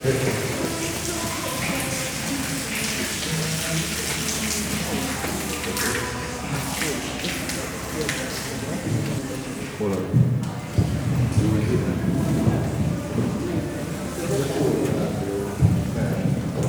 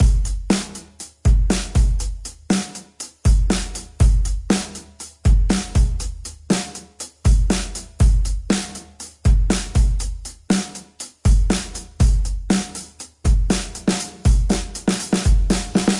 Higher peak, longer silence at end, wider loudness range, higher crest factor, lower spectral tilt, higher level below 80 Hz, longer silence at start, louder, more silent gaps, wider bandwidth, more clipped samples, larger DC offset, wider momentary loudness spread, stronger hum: about the same, -6 dBFS vs -4 dBFS; about the same, 0 s vs 0 s; about the same, 3 LU vs 2 LU; about the same, 18 dB vs 14 dB; about the same, -4.5 dB/octave vs -5 dB/octave; second, -40 dBFS vs -20 dBFS; about the same, 0 s vs 0 s; second, -24 LUFS vs -21 LUFS; neither; first, over 20 kHz vs 11.5 kHz; neither; neither; second, 6 LU vs 15 LU; neither